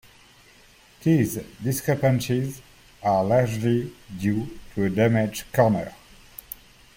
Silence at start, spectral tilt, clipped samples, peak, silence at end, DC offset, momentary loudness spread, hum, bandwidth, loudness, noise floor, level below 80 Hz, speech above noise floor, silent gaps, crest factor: 1 s; -6.5 dB/octave; under 0.1%; -6 dBFS; 1.05 s; under 0.1%; 18 LU; none; 16.5 kHz; -24 LUFS; -53 dBFS; -52 dBFS; 31 dB; none; 18 dB